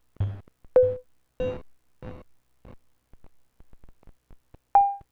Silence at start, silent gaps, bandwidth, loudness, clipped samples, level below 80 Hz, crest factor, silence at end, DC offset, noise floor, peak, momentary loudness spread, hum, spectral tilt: 0.2 s; none; 4 kHz; -25 LUFS; under 0.1%; -50 dBFS; 20 dB; 0.15 s; under 0.1%; -53 dBFS; -8 dBFS; 22 LU; none; -9 dB/octave